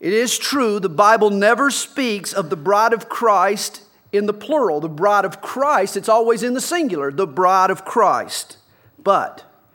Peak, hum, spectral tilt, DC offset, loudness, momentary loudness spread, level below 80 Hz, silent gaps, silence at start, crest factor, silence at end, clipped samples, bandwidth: 0 dBFS; none; -3.5 dB/octave; under 0.1%; -18 LUFS; 8 LU; -74 dBFS; none; 0 s; 18 dB; 0.35 s; under 0.1%; 18 kHz